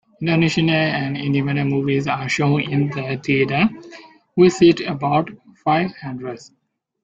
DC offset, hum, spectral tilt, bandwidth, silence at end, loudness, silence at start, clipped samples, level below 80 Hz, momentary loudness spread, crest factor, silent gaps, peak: under 0.1%; none; -6.5 dB/octave; 7.8 kHz; 0.6 s; -19 LUFS; 0.2 s; under 0.1%; -54 dBFS; 14 LU; 16 dB; none; -2 dBFS